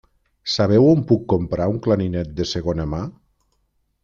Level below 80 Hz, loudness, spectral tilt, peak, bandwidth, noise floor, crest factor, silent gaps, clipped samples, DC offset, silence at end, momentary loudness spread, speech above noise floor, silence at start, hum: -44 dBFS; -20 LUFS; -7 dB/octave; -4 dBFS; 7.6 kHz; -68 dBFS; 16 dB; none; under 0.1%; under 0.1%; 0.9 s; 13 LU; 49 dB; 0.45 s; none